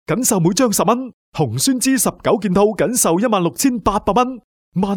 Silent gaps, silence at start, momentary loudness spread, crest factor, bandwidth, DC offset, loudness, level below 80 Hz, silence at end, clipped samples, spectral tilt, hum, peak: 1.14-1.32 s, 4.44-4.72 s; 0.1 s; 7 LU; 16 dB; over 20 kHz; under 0.1%; -16 LUFS; -42 dBFS; 0 s; under 0.1%; -4.5 dB/octave; none; -2 dBFS